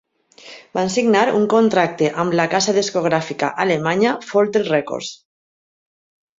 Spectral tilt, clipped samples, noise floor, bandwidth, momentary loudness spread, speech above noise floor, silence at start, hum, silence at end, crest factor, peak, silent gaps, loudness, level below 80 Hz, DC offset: -4.5 dB/octave; under 0.1%; -44 dBFS; 7.8 kHz; 8 LU; 27 dB; 0.45 s; none; 1.25 s; 18 dB; -2 dBFS; none; -18 LUFS; -62 dBFS; under 0.1%